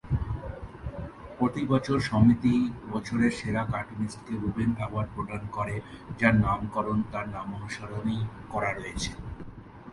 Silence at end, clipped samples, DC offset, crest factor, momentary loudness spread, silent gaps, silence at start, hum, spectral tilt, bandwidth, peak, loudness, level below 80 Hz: 0 s; under 0.1%; under 0.1%; 22 dB; 17 LU; none; 0.05 s; none; -7 dB/octave; 11.5 kHz; -6 dBFS; -29 LUFS; -44 dBFS